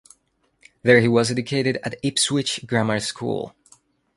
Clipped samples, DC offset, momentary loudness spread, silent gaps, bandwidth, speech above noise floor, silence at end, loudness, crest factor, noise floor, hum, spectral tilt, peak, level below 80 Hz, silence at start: under 0.1%; under 0.1%; 12 LU; none; 11.5 kHz; 46 dB; 0.7 s; -21 LUFS; 22 dB; -67 dBFS; none; -4.5 dB/octave; -2 dBFS; -58 dBFS; 0.85 s